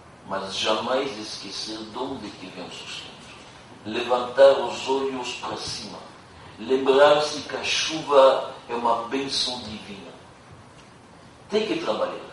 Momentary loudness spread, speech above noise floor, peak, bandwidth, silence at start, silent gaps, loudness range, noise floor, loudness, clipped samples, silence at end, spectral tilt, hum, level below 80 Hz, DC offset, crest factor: 22 LU; 25 dB; -4 dBFS; 11.5 kHz; 0 s; none; 8 LU; -48 dBFS; -23 LUFS; under 0.1%; 0 s; -3 dB/octave; none; -62 dBFS; under 0.1%; 22 dB